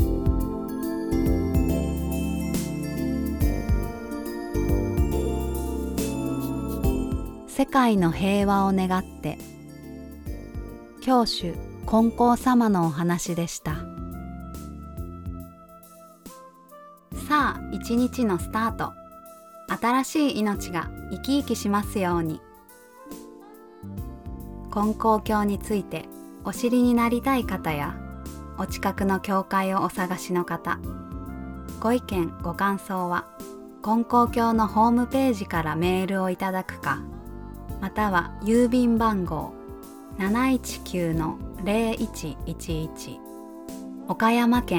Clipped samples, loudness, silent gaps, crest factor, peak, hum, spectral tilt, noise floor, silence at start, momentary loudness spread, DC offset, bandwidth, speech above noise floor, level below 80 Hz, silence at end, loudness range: under 0.1%; -25 LUFS; none; 18 dB; -6 dBFS; none; -6 dB/octave; -50 dBFS; 0 s; 18 LU; under 0.1%; 19 kHz; 26 dB; -36 dBFS; 0 s; 6 LU